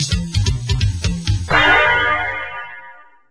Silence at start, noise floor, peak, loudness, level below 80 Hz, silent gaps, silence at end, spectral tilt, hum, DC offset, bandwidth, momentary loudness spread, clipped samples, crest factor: 0 s; -42 dBFS; 0 dBFS; -16 LUFS; -28 dBFS; none; 0.4 s; -4 dB/octave; none; under 0.1%; 11 kHz; 17 LU; under 0.1%; 18 dB